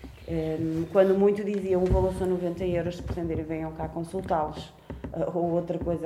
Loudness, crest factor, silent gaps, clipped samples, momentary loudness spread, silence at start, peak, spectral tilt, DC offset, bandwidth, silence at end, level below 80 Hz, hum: -28 LUFS; 18 dB; none; under 0.1%; 11 LU; 0 s; -10 dBFS; -8 dB/octave; under 0.1%; 14 kHz; 0 s; -40 dBFS; none